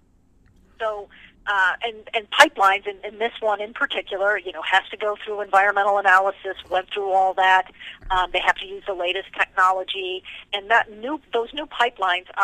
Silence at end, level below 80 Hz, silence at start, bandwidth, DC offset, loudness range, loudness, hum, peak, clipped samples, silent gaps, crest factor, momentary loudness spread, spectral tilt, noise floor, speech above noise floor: 0 s; -50 dBFS; 0.8 s; 15.5 kHz; under 0.1%; 3 LU; -21 LUFS; none; 0 dBFS; under 0.1%; none; 22 dB; 13 LU; -1.5 dB/octave; -57 dBFS; 35 dB